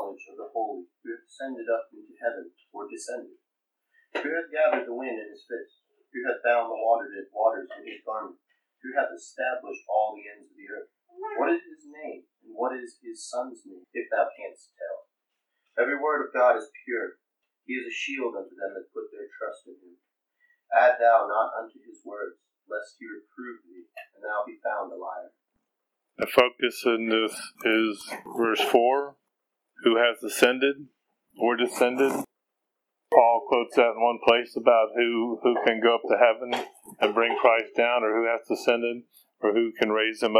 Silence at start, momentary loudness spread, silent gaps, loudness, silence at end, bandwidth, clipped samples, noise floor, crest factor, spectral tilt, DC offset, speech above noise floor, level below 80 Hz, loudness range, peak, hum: 0 s; 20 LU; none; -25 LUFS; 0 s; 16.5 kHz; under 0.1%; -84 dBFS; 26 dB; -3 dB/octave; under 0.1%; 57 dB; -78 dBFS; 12 LU; -2 dBFS; none